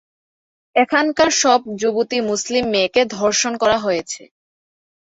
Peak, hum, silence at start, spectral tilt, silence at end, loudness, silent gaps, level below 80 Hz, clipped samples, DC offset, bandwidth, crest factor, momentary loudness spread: -2 dBFS; none; 0.75 s; -2 dB/octave; 0.9 s; -17 LUFS; none; -56 dBFS; under 0.1%; under 0.1%; 8.2 kHz; 16 dB; 7 LU